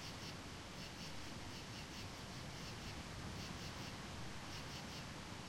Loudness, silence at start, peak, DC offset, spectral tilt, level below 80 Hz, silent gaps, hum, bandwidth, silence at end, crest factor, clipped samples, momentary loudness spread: -49 LUFS; 0 s; -36 dBFS; under 0.1%; -3.5 dB/octave; -60 dBFS; none; none; 16 kHz; 0 s; 14 dB; under 0.1%; 2 LU